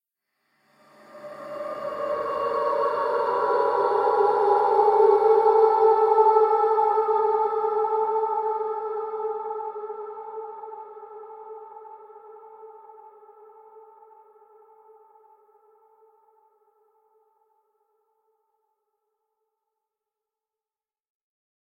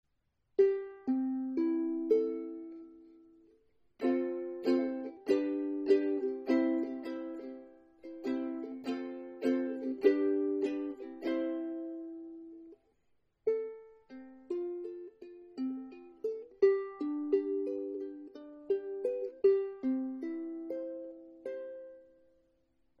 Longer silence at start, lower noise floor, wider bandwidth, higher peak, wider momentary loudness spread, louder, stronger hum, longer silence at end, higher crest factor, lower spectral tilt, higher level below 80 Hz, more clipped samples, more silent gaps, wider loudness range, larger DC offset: first, 1.15 s vs 0.6 s; first, under -90 dBFS vs -79 dBFS; second, 5.6 kHz vs 7.8 kHz; first, -6 dBFS vs -14 dBFS; first, 23 LU vs 20 LU; first, -22 LUFS vs -34 LUFS; neither; first, 7.95 s vs 1 s; about the same, 20 dB vs 20 dB; about the same, -5.5 dB/octave vs -4.5 dB/octave; about the same, -74 dBFS vs -78 dBFS; neither; neither; first, 21 LU vs 8 LU; neither